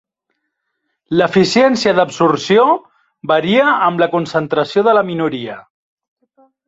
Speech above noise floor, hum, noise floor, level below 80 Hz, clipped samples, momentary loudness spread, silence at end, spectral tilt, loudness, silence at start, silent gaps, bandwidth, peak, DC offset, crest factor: 59 dB; none; -72 dBFS; -56 dBFS; under 0.1%; 8 LU; 1.05 s; -5.5 dB/octave; -14 LUFS; 1.1 s; none; 8 kHz; 0 dBFS; under 0.1%; 14 dB